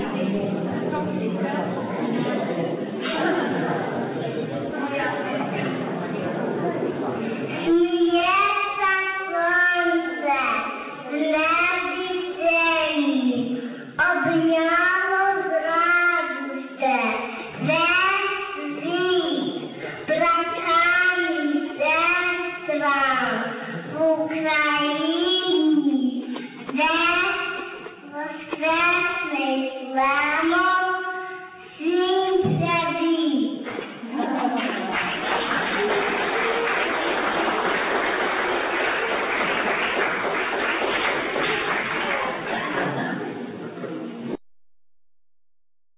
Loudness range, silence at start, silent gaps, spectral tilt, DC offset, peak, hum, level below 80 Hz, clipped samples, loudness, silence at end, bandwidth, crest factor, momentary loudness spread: 5 LU; 0 s; none; -8.5 dB/octave; under 0.1%; -8 dBFS; none; -60 dBFS; under 0.1%; -22 LUFS; 1.3 s; 4 kHz; 14 dB; 11 LU